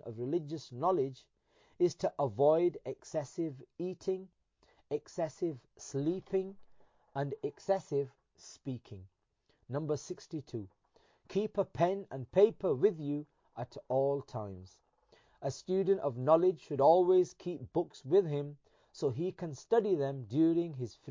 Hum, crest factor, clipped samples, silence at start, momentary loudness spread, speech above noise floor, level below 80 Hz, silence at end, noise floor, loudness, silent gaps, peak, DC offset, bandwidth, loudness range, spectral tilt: none; 20 dB; under 0.1%; 0.05 s; 16 LU; 43 dB; -70 dBFS; 0 s; -76 dBFS; -34 LUFS; none; -14 dBFS; under 0.1%; 7.6 kHz; 9 LU; -7.5 dB/octave